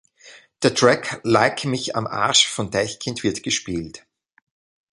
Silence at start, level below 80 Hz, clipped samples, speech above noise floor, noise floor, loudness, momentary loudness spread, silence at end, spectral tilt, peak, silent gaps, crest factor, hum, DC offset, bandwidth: 0.25 s; -54 dBFS; under 0.1%; 28 dB; -48 dBFS; -20 LUFS; 9 LU; 1 s; -3 dB/octave; 0 dBFS; none; 22 dB; none; under 0.1%; 11.5 kHz